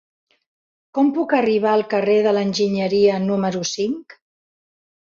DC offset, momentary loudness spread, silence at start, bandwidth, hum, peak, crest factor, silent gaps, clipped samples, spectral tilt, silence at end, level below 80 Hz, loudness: under 0.1%; 7 LU; 0.95 s; 7.6 kHz; none; -4 dBFS; 16 dB; none; under 0.1%; -5.5 dB/octave; 1.05 s; -64 dBFS; -19 LUFS